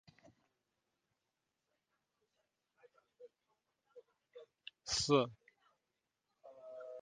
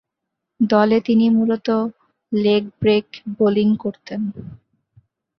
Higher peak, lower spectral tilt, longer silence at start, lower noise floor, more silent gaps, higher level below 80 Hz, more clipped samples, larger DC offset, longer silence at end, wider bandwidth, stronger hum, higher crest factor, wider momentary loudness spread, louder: second, -16 dBFS vs -2 dBFS; second, -4 dB/octave vs -8 dB/octave; first, 3.2 s vs 0.6 s; first, -88 dBFS vs -80 dBFS; neither; second, -72 dBFS vs -56 dBFS; neither; neither; second, 0 s vs 0.8 s; first, 8.4 kHz vs 6 kHz; neither; first, 28 dB vs 18 dB; first, 27 LU vs 12 LU; second, -36 LUFS vs -19 LUFS